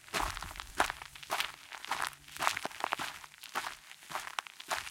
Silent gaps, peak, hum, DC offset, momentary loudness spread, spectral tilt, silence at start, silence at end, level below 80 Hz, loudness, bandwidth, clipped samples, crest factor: none; -8 dBFS; none; under 0.1%; 9 LU; -1 dB/octave; 0 s; 0 s; -56 dBFS; -38 LUFS; 17 kHz; under 0.1%; 30 dB